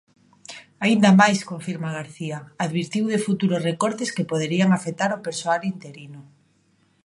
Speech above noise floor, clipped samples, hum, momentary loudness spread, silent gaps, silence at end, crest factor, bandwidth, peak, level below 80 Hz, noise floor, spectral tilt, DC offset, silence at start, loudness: 41 dB; under 0.1%; none; 22 LU; none; 0.8 s; 22 dB; 11.5 kHz; -2 dBFS; -68 dBFS; -63 dBFS; -5.5 dB/octave; under 0.1%; 0.5 s; -22 LUFS